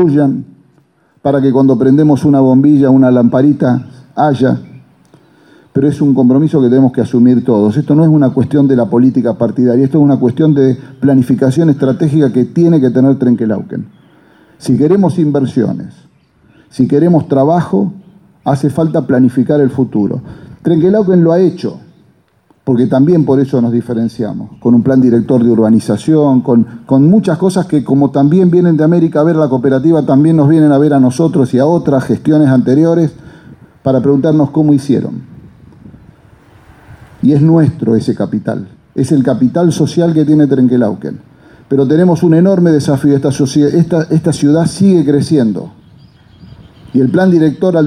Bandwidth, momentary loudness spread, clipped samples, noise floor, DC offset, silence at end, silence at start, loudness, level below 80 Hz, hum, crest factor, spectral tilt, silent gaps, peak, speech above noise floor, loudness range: 11 kHz; 9 LU; under 0.1%; -51 dBFS; under 0.1%; 0 s; 0 s; -10 LUFS; -50 dBFS; none; 10 dB; -8.5 dB/octave; none; 0 dBFS; 42 dB; 5 LU